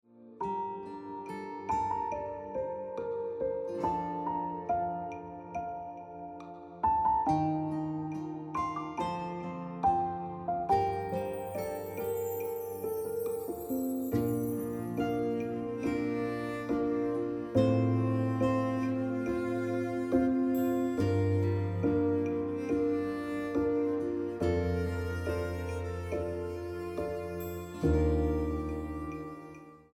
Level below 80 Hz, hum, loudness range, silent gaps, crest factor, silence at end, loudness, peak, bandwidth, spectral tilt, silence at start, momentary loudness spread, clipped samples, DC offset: -50 dBFS; none; 5 LU; none; 18 dB; 0.15 s; -33 LUFS; -14 dBFS; 17.5 kHz; -8 dB/octave; 0.15 s; 10 LU; under 0.1%; under 0.1%